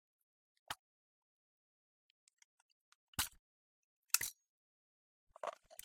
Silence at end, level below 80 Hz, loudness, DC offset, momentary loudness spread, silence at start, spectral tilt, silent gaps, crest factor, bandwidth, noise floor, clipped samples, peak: 0.1 s; -72 dBFS; -42 LUFS; under 0.1%; 14 LU; 0.7 s; 0 dB/octave; 0.79-2.27 s, 2.33-2.37 s, 2.44-3.13 s, 3.39-4.03 s, 4.49-5.27 s; 36 dB; 16.5 kHz; under -90 dBFS; under 0.1%; -14 dBFS